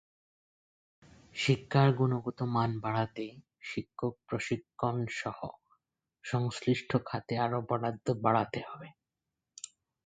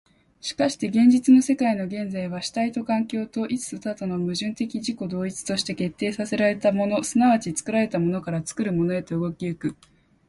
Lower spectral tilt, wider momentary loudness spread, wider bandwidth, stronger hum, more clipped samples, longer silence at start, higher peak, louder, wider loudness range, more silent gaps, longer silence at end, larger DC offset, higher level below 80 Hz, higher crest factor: about the same, -6.5 dB/octave vs -5.5 dB/octave; first, 18 LU vs 11 LU; second, 9.2 kHz vs 11.5 kHz; neither; neither; first, 1.35 s vs 0.45 s; second, -12 dBFS vs -6 dBFS; second, -32 LUFS vs -24 LUFS; about the same, 5 LU vs 5 LU; neither; second, 0.4 s vs 0.55 s; neither; second, -66 dBFS vs -60 dBFS; first, 22 dB vs 16 dB